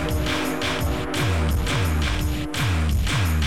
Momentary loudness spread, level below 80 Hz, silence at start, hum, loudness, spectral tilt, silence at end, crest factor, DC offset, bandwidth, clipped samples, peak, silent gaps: 3 LU; -28 dBFS; 0 s; none; -23 LUFS; -5 dB/octave; 0 s; 12 dB; 2%; 16.5 kHz; under 0.1%; -10 dBFS; none